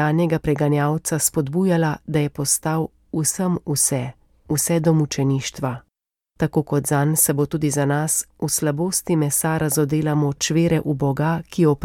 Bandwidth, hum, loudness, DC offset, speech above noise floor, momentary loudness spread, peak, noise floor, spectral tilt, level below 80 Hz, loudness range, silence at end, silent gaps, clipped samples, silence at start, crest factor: 17.5 kHz; none; -20 LUFS; under 0.1%; 56 dB; 5 LU; -4 dBFS; -76 dBFS; -5 dB/octave; -48 dBFS; 2 LU; 0 s; none; under 0.1%; 0 s; 16 dB